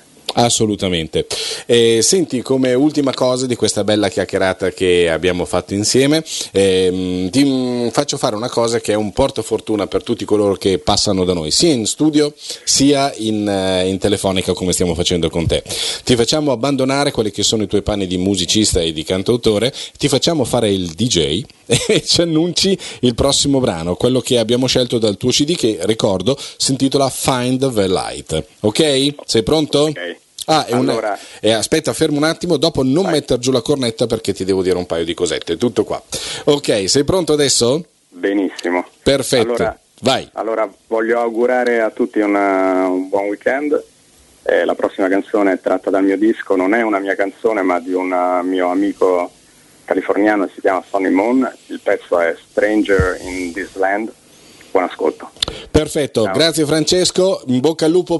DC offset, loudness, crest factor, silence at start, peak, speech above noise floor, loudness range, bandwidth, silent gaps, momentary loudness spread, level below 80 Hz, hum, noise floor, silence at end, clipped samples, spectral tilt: under 0.1%; -16 LUFS; 16 dB; 0.3 s; 0 dBFS; 33 dB; 3 LU; 12 kHz; none; 6 LU; -40 dBFS; none; -49 dBFS; 0 s; under 0.1%; -4 dB/octave